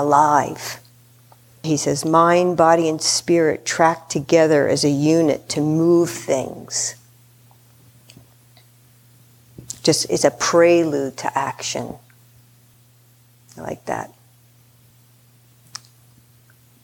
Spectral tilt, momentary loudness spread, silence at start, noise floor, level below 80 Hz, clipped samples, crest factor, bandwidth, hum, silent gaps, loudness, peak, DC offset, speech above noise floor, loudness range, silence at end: -4.5 dB/octave; 18 LU; 0 s; -53 dBFS; -60 dBFS; under 0.1%; 20 dB; 18.5 kHz; none; none; -18 LUFS; 0 dBFS; under 0.1%; 35 dB; 19 LU; 2.8 s